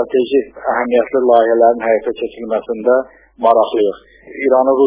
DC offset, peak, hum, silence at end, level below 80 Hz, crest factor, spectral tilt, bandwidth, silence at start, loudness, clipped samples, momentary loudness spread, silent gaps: under 0.1%; 0 dBFS; none; 0 s; -54 dBFS; 14 dB; -8.5 dB/octave; 4 kHz; 0 s; -15 LUFS; under 0.1%; 10 LU; none